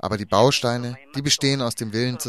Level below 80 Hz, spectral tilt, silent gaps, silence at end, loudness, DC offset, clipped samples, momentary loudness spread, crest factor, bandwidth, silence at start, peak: -54 dBFS; -4 dB/octave; none; 0 s; -21 LUFS; 0.2%; under 0.1%; 10 LU; 18 dB; 14.5 kHz; 0.05 s; -4 dBFS